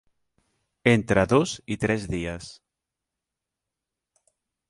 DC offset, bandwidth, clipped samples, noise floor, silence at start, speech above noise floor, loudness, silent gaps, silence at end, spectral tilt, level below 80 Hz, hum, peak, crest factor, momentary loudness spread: under 0.1%; 11.5 kHz; under 0.1%; -86 dBFS; 0.85 s; 63 dB; -24 LUFS; none; 2.2 s; -6 dB/octave; -50 dBFS; none; -4 dBFS; 24 dB; 14 LU